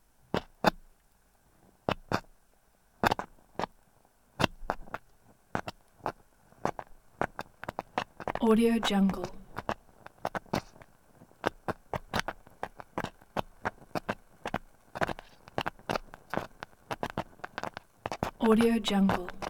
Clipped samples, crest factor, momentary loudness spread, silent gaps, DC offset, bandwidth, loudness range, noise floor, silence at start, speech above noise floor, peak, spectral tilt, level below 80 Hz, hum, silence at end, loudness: under 0.1%; 26 dB; 16 LU; none; under 0.1%; 18 kHz; 8 LU; -66 dBFS; 0.35 s; 40 dB; -8 dBFS; -5.5 dB/octave; -52 dBFS; none; 0 s; -33 LUFS